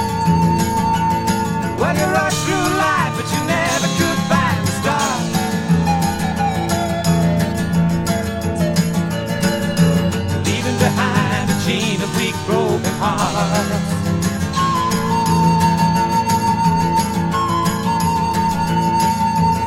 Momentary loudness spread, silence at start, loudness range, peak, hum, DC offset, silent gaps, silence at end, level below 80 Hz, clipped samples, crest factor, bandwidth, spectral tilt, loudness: 4 LU; 0 s; 2 LU; -2 dBFS; none; under 0.1%; none; 0 s; -38 dBFS; under 0.1%; 16 dB; 16.5 kHz; -5 dB/octave; -17 LUFS